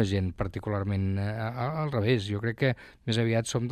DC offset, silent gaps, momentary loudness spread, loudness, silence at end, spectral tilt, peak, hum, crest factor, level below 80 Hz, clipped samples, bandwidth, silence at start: under 0.1%; none; 5 LU; -29 LUFS; 0 s; -6 dB/octave; -10 dBFS; none; 18 dB; -52 dBFS; under 0.1%; 13 kHz; 0 s